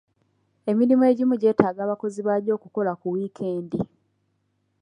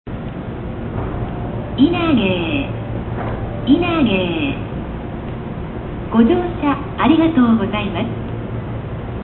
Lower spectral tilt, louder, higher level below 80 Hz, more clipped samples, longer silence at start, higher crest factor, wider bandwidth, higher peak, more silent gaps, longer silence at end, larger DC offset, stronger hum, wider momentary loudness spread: second, -8.5 dB/octave vs -12 dB/octave; second, -23 LUFS vs -19 LUFS; second, -64 dBFS vs -32 dBFS; neither; first, 0.65 s vs 0.05 s; about the same, 22 dB vs 18 dB; first, 9.8 kHz vs 4.2 kHz; about the same, -2 dBFS vs -2 dBFS; neither; first, 0.95 s vs 0 s; neither; first, 50 Hz at -55 dBFS vs none; about the same, 12 LU vs 13 LU